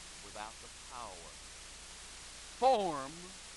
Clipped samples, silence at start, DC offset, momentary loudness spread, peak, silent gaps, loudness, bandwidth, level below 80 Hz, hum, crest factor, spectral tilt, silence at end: under 0.1%; 0 s; under 0.1%; 18 LU; -16 dBFS; none; -39 LUFS; 11.5 kHz; -60 dBFS; none; 22 dB; -3 dB/octave; 0 s